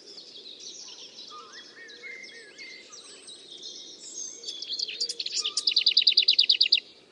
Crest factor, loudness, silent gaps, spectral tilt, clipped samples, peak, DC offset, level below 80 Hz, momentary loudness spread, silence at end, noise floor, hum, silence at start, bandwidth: 22 dB; -22 LUFS; none; 3 dB/octave; under 0.1%; -6 dBFS; under 0.1%; -88 dBFS; 25 LU; 0.3 s; -47 dBFS; none; 0.05 s; 11.5 kHz